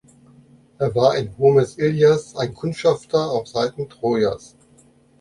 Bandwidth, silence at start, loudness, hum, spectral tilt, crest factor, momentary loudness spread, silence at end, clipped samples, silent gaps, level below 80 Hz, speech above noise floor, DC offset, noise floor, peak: 11.5 kHz; 0.8 s; -20 LUFS; none; -6.5 dB/octave; 18 dB; 9 LU; 0.85 s; under 0.1%; none; -54 dBFS; 35 dB; under 0.1%; -54 dBFS; -2 dBFS